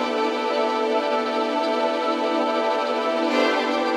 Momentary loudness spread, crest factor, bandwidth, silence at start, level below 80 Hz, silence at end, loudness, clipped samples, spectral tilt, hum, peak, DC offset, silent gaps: 3 LU; 14 dB; 13 kHz; 0 s; -72 dBFS; 0 s; -22 LUFS; under 0.1%; -2.5 dB/octave; none; -8 dBFS; under 0.1%; none